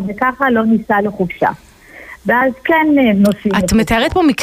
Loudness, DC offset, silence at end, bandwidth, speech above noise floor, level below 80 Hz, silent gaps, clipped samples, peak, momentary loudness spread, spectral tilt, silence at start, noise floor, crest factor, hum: -14 LUFS; under 0.1%; 0 s; 15.5 kHz; 23 dB; -36 dBFS; none; under 0.1%; -2 dBFS; 7 LU; -5.5 dB/octave; 0 s; -36 dBFS; 12 dB; none